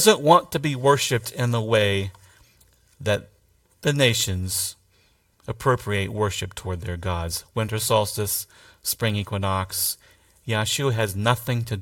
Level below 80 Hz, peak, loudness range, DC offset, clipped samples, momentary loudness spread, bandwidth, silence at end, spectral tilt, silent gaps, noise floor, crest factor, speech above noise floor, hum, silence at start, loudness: -50 dBFS; 0 dBFS; 2 LU; under 0.1%; under 0.1%; 11 LU; 17 kHz; 0 s; -4 dB/octave; none; -62 dBFS; 22 dB; 39 dB; none; 0 s; -23 LUFS